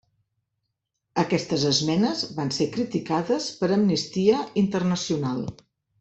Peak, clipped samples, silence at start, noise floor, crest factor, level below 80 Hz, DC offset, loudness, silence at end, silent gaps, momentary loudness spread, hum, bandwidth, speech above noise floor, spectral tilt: -6 dBFS; under 0.1%; 1.15 s; -80 dBFS; 18 dB; -60 dBFS; under 0.1%; -24 LUFS; 0.5 s; none; 6 LU; none; 8.4 kHz; 56 dB; -5 dB/octave